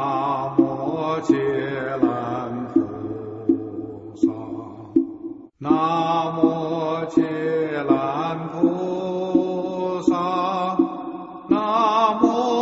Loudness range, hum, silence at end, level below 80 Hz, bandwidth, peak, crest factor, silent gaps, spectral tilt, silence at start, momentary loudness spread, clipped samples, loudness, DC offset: 3 LU; none; 0 s; -60 dBFS; 7.8 kHz; -2 dBFS; 18 dB; none; -7 dB/octave; 0 s; 12 LU; under 0.1%; -22 LUFS; under 0.1%